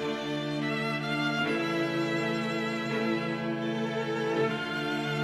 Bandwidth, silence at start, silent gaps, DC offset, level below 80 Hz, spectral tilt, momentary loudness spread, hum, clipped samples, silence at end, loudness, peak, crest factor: 15 kHz; 0 s; none; under 0.1%; -70 dBFS; -5.5 dB/octave; 3 LU; none; under 0.1%; 0 s; -30 LUFS; -16 dBFS; 14 dB